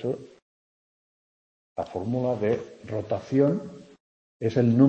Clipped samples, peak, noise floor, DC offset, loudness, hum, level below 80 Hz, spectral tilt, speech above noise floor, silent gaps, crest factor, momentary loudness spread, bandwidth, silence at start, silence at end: under 0.1%; -6 dBFS; under -90 dBFS; under 0.1%; -27 LUFS; none; -64 dBFS; -9 dB/octave; over 66 dB; 0.42-1.76 s, 4.00-4.40 s; 20 dB; 13 LU; 8 kHz; 0 s; 0 s